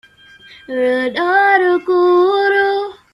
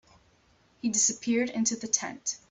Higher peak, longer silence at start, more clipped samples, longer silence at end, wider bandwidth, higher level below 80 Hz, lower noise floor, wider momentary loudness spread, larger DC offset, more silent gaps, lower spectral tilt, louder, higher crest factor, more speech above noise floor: first, -2 dBFS vs -8 dBFS; second, 0.7 s vs 0.85 s; neither; about the same, 0.2 s vs 0.15 s; first, 11 kHz vs 8.4 kHz; first, -62 dBFS vs -70 dBFS; second, -43 dBFS vs -64 dBFS; about the same, 7 LU vs 9 LU; neither; neither; first, -4.5 dB/octave vs -2 dB/octave; first, -14 LUFS vs -27 LUFS; second, 14 dB vs 22 dB; second, 30 dB vs 35 dB